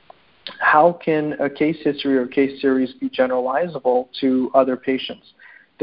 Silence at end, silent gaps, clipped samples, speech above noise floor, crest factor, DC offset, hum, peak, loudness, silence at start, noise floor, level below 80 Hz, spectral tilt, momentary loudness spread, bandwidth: 0.7 s; none; under 0.1%; 21 dB; 20 dB; under 0.1%; none; 0 dBFS; -19 LUFS; 0.45 s; -41 dBFS; -62 dBFS; -10.5 dB/octave; 9 LU; 5.4 kHz